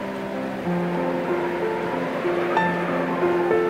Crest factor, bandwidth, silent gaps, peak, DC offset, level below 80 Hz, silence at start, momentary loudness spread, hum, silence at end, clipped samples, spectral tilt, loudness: 18 dB; 15.5 kHz; none; -6 dBFS; under 0.1%; -60 dBFS; 0 s; 6 LU; none; 0 s; under 0.1%; -7 dB/octave; -24 LUFS